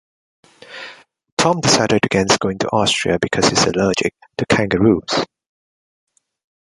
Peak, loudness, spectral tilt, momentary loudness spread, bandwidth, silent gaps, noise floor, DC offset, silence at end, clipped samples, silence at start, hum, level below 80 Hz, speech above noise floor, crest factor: 0 dBFS; -16 LUFS; -4 dB/octave; 16 LU; 11.5 kHz; 1.32-1.37 s; -40 dBFS; under 0.1%; 1.35 s; under 0.1%; 0.7 s; none; -46 dBFS; 24 dB; 18 dB